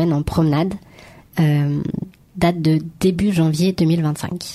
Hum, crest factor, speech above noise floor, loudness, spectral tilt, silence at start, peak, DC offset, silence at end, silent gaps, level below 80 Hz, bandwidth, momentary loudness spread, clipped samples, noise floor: none; 16 dB; 26 dB; -19 LUFS; -7 dB/octave; 0 s; -4 dBFS; under 0.1%; 0 s; none; -40 dBFS; 14.5 kHz; 10 LU; under 0.1%; -44 dBFS